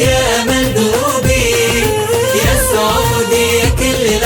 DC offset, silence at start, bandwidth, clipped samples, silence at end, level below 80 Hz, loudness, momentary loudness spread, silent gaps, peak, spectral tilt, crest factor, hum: under 0.1%; 0 s; 19.5 kHz; under 0.1%; 0 s; -24 dBFS; -12 LUFS; 2 LU; none; -2 dBFS; -3.5 dB/octave; 12 dB; none